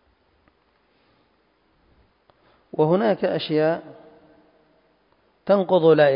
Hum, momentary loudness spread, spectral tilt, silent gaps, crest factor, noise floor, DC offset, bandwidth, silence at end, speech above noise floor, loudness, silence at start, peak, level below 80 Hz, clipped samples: none; 14 LU; -11 dB/octave; none; 20 dB; -64 dBFS; under 0.1%; 5.4 kHz; 0 s; 45 dB; -21 LUFS; 2.75 s; -4 dBFS; -68 dBFS; under 0.1%